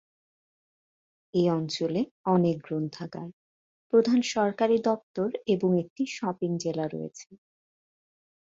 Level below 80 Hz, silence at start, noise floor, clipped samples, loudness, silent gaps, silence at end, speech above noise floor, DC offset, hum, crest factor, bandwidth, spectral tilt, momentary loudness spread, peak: -70 dBFS; 1.35 s; under -90 dBFS; under 0.1%; -27 LUFS; 2.11-2.24 s, 3.33-3.90 s, 5.03-5.14 s, 5.90-5.96 s; 1.1 s; over 63 dB; under 0.1%; none; 18 dB; 7.8 kHz; -6.5 dB/octave; 13 LU; -10 dBFS